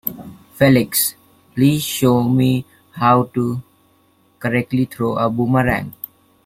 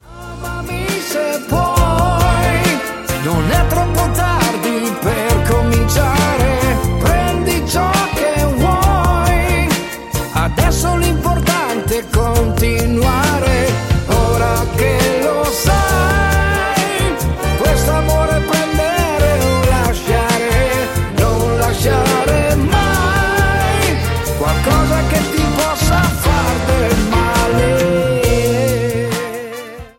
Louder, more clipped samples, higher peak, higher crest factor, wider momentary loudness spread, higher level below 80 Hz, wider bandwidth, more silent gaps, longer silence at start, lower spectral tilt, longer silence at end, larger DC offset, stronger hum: about the same, -17 LUFS vs -15 LUFS; neither; about the same, 0 dBFS vs 0 dBFS; about the same, 18 dB vs 14 dB; first, 16 LU vs 4 LU; second, -48 dBFS vs -20 dBFS; about the same, 16.5 kHz vs 17 kHz; neither; about the same, 0.05 s vs 0.05 s; about the same, -5.5 dB/octave vs -5 dB/octave; first, 0.55 s vs 0.1 s; neither; neither